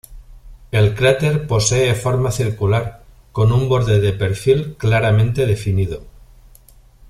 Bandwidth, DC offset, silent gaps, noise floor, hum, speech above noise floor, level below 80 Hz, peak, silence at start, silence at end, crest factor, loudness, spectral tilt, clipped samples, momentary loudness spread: 13.5 kHz; under 0.1%; none; -46 dBFS; none; 31 dB; -38 dBFS; -2 dBFS; 0.1 s; 1 s; 16 dB; -17 LUFS; -5.5 dB/octave; under 0.1%; 6 LU